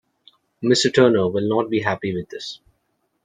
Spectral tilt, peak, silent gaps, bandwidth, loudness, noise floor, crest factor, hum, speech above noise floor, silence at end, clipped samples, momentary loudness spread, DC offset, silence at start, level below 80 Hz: -5 dB/octave; -2 dBFS; none; 9.6 kHz; -19 LUFS; -70 dBFS; 18 dB; none; 51 dB; 0.7 s; under 0.1%; 17 LU; under 0.1%; 0.6 s; -60 dBFS